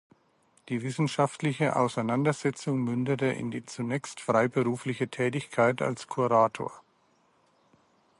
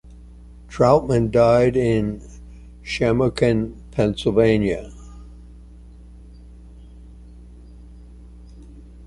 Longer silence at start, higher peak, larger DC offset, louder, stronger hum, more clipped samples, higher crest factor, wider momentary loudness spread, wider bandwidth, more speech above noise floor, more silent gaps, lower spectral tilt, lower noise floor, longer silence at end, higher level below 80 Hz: first, 0.65 s vs 0.05 s; second, -10 dBFS vs -2 dBFS; neither; second, -28 LUFS vs -19 LUFS; neither; neither; about the same, 20 dB vs 20 dB; second, 9 LU vs 23 LU; about the same, 11.5 kHz vs 11.5 kHz; first, 39 dB vs 24 dB; neither; about the same, -6 dB/octave vs -7 dB/octave; first, -67 dBFS vs -42 dBFS; first, 1.4 s vs 0 s; second, -72 dBFS vs -40 dBFS